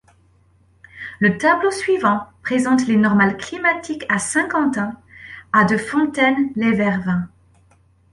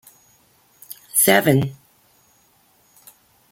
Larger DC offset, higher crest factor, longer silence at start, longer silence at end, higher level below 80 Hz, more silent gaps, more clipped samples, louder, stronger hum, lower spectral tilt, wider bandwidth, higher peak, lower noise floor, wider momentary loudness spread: neither; about the same, 18 dB vs 22 dB; about the same, 0.95 s vs 0.9 s; second, 0.85 s vs 1.8 s; first, -54 dBFS vs -60 dBFS; neither; neither; about the same, -18 LUFS vs -17 LUFS; neither; first, -5.5 dB/octave vs -4 dB/octave; second, 11.5 kHz vs 17 kHz; about the same, -2 dBFS vs -2 dBFS; about the same, -56 dBFS vs -58 dBFS; second, 11 LU vs 25 LU